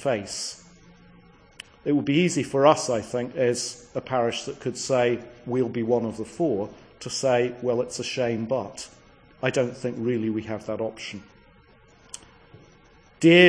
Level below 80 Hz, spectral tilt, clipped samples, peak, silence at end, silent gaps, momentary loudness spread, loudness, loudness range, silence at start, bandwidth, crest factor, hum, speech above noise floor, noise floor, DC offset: -60 dBFS; -4.5 dB/octave; under 0.1%; -2 dBFS; 0 s; none; 16 LU; -26 LUFS; 6 LU; 0 s; 10.5 kHz; 22 dB; none; 31 dB; -55 dBFS; under 0.1%